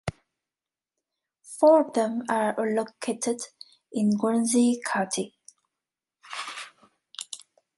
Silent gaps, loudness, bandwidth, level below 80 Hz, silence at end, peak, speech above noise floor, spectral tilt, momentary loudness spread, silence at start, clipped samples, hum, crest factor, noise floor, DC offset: none; -25 LUFS; 11.5 kHz; -62 dBFS; 0.4 s; -8 dBFS; over 66 dB; -4.5 dB/octave; 19 LU; 0.05 s; under 0.1%; none; 18 dB; under -90 dBFS; under 0.1%